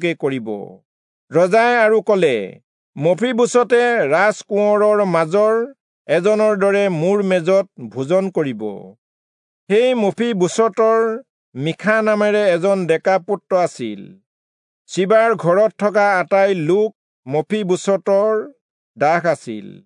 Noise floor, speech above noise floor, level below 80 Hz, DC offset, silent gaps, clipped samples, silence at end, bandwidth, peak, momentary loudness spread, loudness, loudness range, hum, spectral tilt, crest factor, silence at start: under -90 dBFS; over 74 dB; -76 dBFS; under 0.1%; 0.85-1.28 s, 2.64-2.93 s, 5.80-6.05 s, 8.98-9.67 s, 11.30-11.52 s, 14.26-14.85 s, 16.95-17.23 s, 18.61-18.94 s; under 0.1%; 0.15 s; 11 kHz; -2 dBFS; 12 LU; -16 LUFS; 3 LU; none; -5.5 dB/octave; 14 dB; 0 s